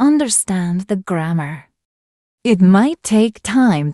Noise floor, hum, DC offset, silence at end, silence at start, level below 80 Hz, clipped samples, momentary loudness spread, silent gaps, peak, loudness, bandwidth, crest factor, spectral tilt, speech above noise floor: under -90 dBFS; none; under 0.1%; 0 s; 0 s; -54 dBFS; under 0.1%; 11 LU; 1.85-2.38 s; -2 dBFS; -15 LUFS; 13 kHz; 14 dB; -5.5 dB/octave; over 75 dB